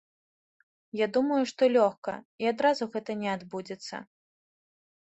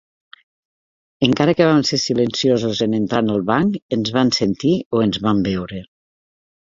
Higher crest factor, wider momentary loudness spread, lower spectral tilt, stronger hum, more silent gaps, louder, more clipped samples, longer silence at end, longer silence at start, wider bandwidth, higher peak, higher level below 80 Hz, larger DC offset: about the same, 20 dB vs 18 dB; first, 15 LU vs 6 LU; about the same, -5 dB/octave vs -5.5 dB/octave; neither; about the same, 1.98-2.02 s, 2.25-2.38 s vs 3.82-3.89 s, 4.86-4.91 s; second, -28 LUFS vs -18 LUFS; neither; about the same, 1 s vs 0.9 s; second, 0.95 s vs 1.2 s; about the same, 8.2 kHz vs 7.8 kHz; second, -10 dBFS vs -2 dBFS; second, -76 dBFS vs -50 dBFS; neither